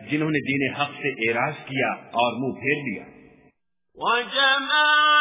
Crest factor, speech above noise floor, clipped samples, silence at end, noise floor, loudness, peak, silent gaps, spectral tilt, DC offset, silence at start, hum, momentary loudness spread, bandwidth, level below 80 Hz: 16 dB; 41 dB; under 0.1%; 0 s; -64 dBFS; -22 LUFS; -8 dBFS; none; -8 dB/octave; under 0.1%; 0 s; none; 9 LU; 3.9 kHz; -64 dBFS